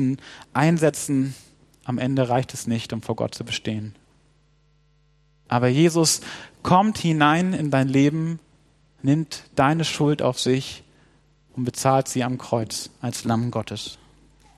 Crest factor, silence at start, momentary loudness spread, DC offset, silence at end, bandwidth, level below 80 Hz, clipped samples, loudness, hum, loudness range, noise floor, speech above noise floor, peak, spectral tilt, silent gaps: 22 dB; 0 s; 14 LU; under 0.1%; 0.6 s; 14 kHz; -58 dBFS; under 0.1%; -22 LUFS; none; 7 LU; -61 dBFS; 39 dB; -2 dBFS; -5 dB/octave; none